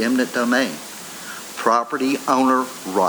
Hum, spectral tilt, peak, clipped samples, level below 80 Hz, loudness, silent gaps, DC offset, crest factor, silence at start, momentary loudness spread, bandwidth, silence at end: none; -3.5 dB/octave; -2 dBFS; under 0.1%; -66 dBFS; -20 LUFS; none; under 0.1%; 18 dB; 0 s; 14 LU; over 20 kHz; 0 s